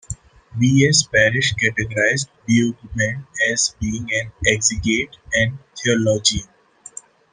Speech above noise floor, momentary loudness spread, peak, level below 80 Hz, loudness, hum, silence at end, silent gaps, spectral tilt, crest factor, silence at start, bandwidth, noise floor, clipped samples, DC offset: 22 dB; 15 LU; 0 dBFS; -42 dBFS; -18 LUFS; none; 0.45 s; none; -3.5 dB/octave; 20 dB; 0.1 s; 10.5 kHz; -41 dBFS; under 0.1%; under 0.1%